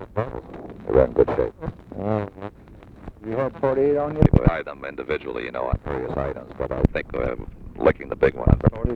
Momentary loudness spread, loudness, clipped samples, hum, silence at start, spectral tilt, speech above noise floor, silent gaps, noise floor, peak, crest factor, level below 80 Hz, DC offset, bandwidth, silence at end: 16 LU; -23 LUFS; under 0.1%; none; 0 s; -10 dB/octave; 23 dB; none; -45 dBFS; 0 dBFS; 22 dB; -32 dBFS; under 0.1%; 6.2 kHz; 0 s